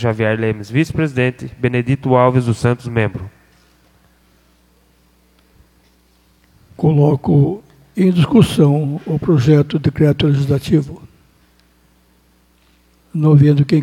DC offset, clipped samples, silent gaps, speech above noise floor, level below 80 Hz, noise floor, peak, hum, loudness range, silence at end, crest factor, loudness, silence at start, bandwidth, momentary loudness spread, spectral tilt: under 0.1%; under 0.1%; none; 41 dB; -44 dBFS; -54 dBFS; 0 dBFS; none; 8 LU; 0 s; 16 dB; -15 LUFS; 0 s; 12 kHz; 8 LU; -8 dB/octave